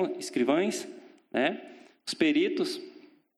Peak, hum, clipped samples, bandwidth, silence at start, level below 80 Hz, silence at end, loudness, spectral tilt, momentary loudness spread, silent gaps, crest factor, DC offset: -12 dBFS; none; under 0.1%; 13.5 kHz; 0 s; -78 dBFS; 0.4 s; -29 LUFS; -4 dB/octave; 16 LU; none; 18 dB; under 0.1%